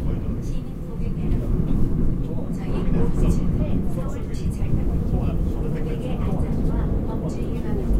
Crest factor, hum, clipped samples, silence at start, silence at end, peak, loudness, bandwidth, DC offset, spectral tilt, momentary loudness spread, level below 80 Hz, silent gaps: 16 dB; none; under 0.1%; 0 s; 0 s; -6 dBFS; -25 LUFS; 11 kHz; under 0.1%; -9 dB/octave; 5 LU; -24 dBFS; none